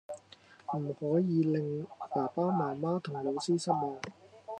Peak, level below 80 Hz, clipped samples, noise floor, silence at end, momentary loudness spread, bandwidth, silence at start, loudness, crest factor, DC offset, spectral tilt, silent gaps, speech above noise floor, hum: -14 dBFS; -80 dBFS; under 0.1%; -58 dBFS; 0 s; 17 LU; 10.5 kHz; 0.1 s; -33 LUFS; 20 dB; under 0.1%; -7 dB/octave; none; 26 dB; none